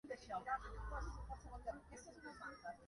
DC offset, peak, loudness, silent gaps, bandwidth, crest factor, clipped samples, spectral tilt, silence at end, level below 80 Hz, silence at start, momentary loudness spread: under 0.1%; -32 dBFS; -50 LUFS; none; 11.5 kHz; 18 dB; under 0.1%; -5 dB/octave; 0 s; -54 dBFS; 0.05 s; 11 LU